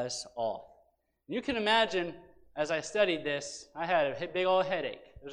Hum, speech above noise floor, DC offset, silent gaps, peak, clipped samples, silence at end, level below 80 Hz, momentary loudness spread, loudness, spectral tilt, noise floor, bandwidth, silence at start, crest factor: none; 39 dB; under 0.1%; none; -12 dBFS; under 0.1%; 0 s; -64 dBFS; 13 LU; -31 LUFS; -3.5 dB/octave; -70 dBFS; 10.5 kHz; 0 s; 20 dB